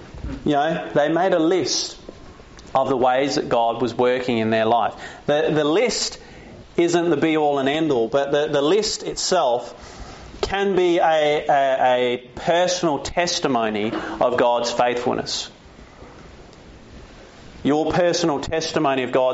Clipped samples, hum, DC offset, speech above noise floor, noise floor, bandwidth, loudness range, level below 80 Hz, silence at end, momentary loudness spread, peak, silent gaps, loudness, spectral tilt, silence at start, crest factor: under 0.1%; none; under 0.1%; 25 dB; -44 dBFS; 8 kHz; 4 LU; -46 dBFS; 0 s; 8 LU; -6 dBFS; none; -20 LUFS; -3.5 dB/octave; 0 s; 16 dB